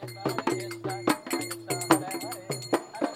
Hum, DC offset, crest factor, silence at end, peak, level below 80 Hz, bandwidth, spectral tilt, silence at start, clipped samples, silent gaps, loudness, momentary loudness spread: none; under 0.1%; 26 dB; 0 s; -4 dBFS; -72 dBFS; 17 kHz; -4 dB/octave; 0 s; under 0.1%; none; -30 LUFS; 9 LU